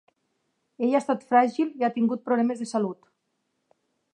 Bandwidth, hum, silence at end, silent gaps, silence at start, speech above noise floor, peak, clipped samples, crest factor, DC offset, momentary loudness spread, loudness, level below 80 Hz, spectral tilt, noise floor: 10 kHz; none; 1.2 s; none; 0.8 s; 52 dB; -6 dBFS; under 0.1%; 20 dB; under 0.1%; 8 LU; -25 LUFS; -82 dBFS; -6 dB/octave; -76 dBFS